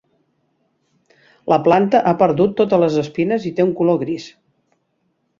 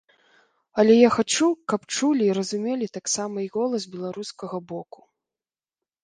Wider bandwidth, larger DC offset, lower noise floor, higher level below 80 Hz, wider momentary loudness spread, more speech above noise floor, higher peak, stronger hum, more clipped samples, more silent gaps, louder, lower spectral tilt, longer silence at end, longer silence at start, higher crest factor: second, 7.4 kHz vs 10 kHz; neither; second, -67 dBFS vs under -90 dBFS; first, -58 dBFS vs -68 dBFS; second, 11 LU vs 16 LU; second, 52 dB vs over 67 dB; about the same, -2 dBFS vs -2 dBFS; neither; neither; neither; first, -17 LUFS vs -23 LUFS; first, -7.5 dB/octave vs -4 dB/octave; about the same, 1.1 s vs 1.2 s; first, 1.45 s vs 0.75 s; about the same, 18 dB vs 22 dB